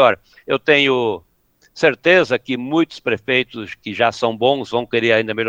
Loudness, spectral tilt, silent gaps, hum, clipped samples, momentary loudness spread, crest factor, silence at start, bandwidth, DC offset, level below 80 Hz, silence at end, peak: -17 LUFS; -5 dB/octave; none; none; under 0.1%; 11 LU; 18 dB; 0 s; 16 kHz; under 0.1%; -60 dBFS; 0 s; 0 dBFS